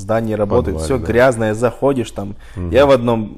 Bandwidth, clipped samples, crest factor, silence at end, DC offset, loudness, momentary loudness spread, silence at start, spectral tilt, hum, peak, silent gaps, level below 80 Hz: 14 kHz; under 0.1%; 12 dB; 0 s; under 0.1%; -15 LUFS; 14 LU; 0 s; -6.5 dB/octave; none; -2 dBFS; none; -34 dBFS